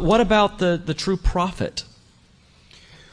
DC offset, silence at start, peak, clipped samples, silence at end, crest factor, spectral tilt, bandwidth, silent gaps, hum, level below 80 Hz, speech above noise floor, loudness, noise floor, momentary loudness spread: under 0.1%; 0 s; -4 dBFS; under 0.1%; 1.3 s; 18 dB; -5.5 dB/octave; 10.5 kHz; none; none; -32 dBFS; 34 dB; -21 LUFS; -54 dBFS; 12 LU